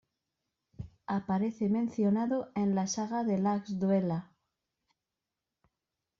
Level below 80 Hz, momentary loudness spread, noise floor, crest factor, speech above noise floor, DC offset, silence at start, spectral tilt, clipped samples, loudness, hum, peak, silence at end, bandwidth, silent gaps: -66 dBFS; 8 LU; -89 dBFS; 16 dB; 59 dB; under 0.1%; 0.8 s; -7.5 dB/octave; under 0.1%; -31 LUFS; none; -18 dBFS; 1.95 s; 7.4 kHz; none